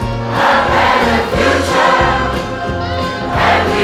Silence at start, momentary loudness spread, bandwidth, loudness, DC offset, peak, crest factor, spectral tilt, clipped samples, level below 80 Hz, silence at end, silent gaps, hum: 0 s; 8 LU; 16.5 kHz; -13 LUFS; under 0.1%; 0 dBFS; 12 dB; -5 dB/octave; under 0.1%; -30 dBFS; 0 s; none; none